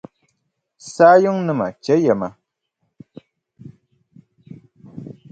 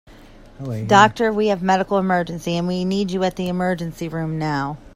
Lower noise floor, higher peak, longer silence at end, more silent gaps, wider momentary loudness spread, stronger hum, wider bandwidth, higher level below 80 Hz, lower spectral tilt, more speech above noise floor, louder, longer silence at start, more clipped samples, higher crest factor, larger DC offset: first, -73 dBFS vs -44 dBFS; about the same, 0 dBFS vs 0 dBFS; first, 0.2 s vs 0.05 s; neither; first, 26 LU vs 12 LU; neither; second, 9 kHz vs 14.5 kHz; second, -64 dBFS vs -46 dBFS; about the same, -6.5 dB/octave vs -6 dB/octave; first, 57 dB vs 24 dB; first, -16 LUFS vs -20 LUFS; first, 0.85 s vs 0.1 s; neither; about the same, 20 dB vs 20 dB; neither